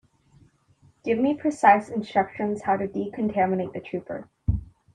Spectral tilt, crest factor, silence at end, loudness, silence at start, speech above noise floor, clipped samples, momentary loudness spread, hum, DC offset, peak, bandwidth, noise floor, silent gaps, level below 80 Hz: -7.5 dB/octave; 22 dB; 0.3 s; -25 LUFS; 1.05 s; 36 dB; under 0.1%; 14 LU; none; under 0.1%; -4 dBFS; 10 kHz; -60 dBFS; none; -44 dBFS